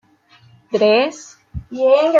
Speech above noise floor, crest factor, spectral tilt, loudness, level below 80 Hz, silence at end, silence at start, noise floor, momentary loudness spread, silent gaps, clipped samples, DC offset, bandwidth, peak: 37 dB; 16 dB; -5 dB/octave; -16 LUFS; -44 dBFS; 0 s; 0.7 s; -51 dBFS; 20 LU; none; under 0.1%; under 0.1%; 7.8 kHz; -2 dBFS